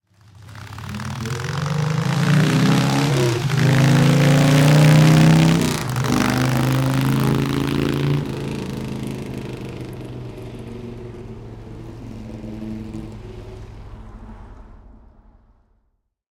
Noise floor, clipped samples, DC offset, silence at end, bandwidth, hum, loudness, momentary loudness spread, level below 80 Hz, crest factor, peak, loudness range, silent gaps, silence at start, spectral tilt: -69 dBFS; under 0.1%; under 0.1%; 1.65 s; 18.5 kHz; none; -17 LUFS; 23 LU; -42 dBFS; 16 dB; -4 dBFS; 20 LU; none; 0.4 s; -6 dB/octave